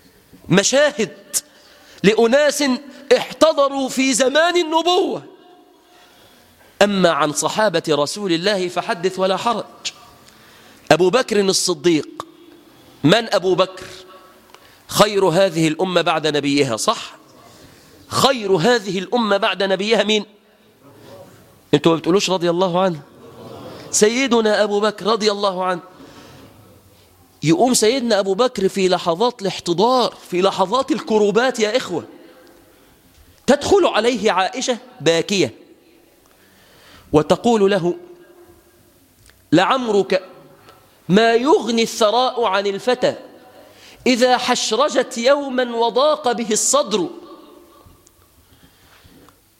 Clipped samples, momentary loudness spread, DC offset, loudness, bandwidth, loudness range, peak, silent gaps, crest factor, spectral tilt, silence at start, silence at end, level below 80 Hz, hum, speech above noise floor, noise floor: under 0.1%; 9 LU; under 0.1%; -17 LUFS; 16.5 kHz; 3 LU; 0 dBFS; none; 18 dB; -3.5 dB/octave; 0.45 s; 2.25 s; -56 dBFS; none; 36 dB; -53 dBFS